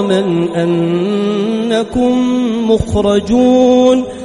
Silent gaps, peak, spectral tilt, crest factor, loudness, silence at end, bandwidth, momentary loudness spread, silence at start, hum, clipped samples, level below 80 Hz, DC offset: none; 0 dBFS; -6.5 dB/octave; 12 dB; -12 LUFS; 0 s; 11 kHz; 6 LU; 0 s; none; under 0.1%; -36 dBFS; under 0.1%